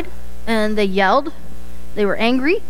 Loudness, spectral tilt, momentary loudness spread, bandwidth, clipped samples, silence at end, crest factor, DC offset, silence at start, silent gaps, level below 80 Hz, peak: -18 LUFS; -5.5 dB/octave; 18 LU; 16.5 kHz; under 0.1%; 0 s; 16 dB; 10%; 0 s; none; -38 dBFS; -4 dBFS